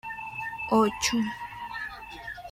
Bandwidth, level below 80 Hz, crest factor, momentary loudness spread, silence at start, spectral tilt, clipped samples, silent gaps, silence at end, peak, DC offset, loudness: 16 kHz; -56 dBFS; 18 dB; 15 LU; 0.05 s; -3.5 dB/octave; under 0.1%; none; 0 s; -12 dBFS; under 0.1%; -29 LUFS